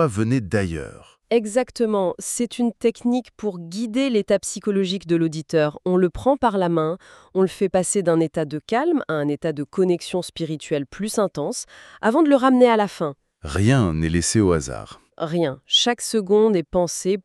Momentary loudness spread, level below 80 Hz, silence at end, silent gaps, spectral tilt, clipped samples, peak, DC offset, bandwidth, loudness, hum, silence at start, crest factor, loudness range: 11 LU; -46 dBFS; 0.05 s; none; -5 dB/octave; under 0.1%; -4 dBFS; under 0.1%; 13.5 kHz; -21 LUFS; none; 0 s; 18 dB; 4 LU